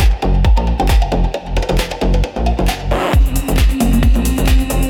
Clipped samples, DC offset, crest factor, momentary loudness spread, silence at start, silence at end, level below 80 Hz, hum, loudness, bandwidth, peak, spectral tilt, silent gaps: under 0.1%; under 0.1%; 10 dB; 4 LU; 0 s; 0 s; -14 dBFS; none; -16 LUFS; 17 kHz; -2 dBFS; -6 dB/octave; none